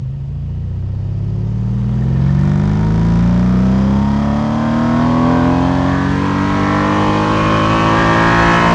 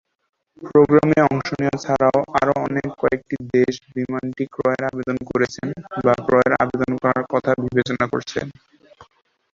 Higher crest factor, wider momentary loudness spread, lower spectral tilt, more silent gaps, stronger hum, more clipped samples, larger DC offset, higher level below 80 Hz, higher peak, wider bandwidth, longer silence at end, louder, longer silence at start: second, 12 dB vs 18 dB; about the same, 9 LU vs 10 LU; about the same, -7.5 dB/octave vs -7 dB/octave; neither; neither; neither; neither; first, -26 dBFS vs -52 dBFS; about the same, 0 dBFS vs -2 dBFS; first, 9.2 kHz vs 7.6 kHz; second, 0 s vs 0.5 s; first, -14 LUFS vs -20 LUFS; second, 0 s vs 0.6 s